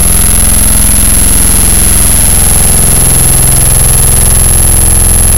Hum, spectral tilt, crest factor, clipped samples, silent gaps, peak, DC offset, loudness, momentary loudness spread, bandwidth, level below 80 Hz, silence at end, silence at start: none; -3 dB/octave; 6 dB; 10%; none; 0 dBFS; 20%; -4 LUFS; 1 LU; over 20 kHz; -10 dBFS; 0 s; 0 s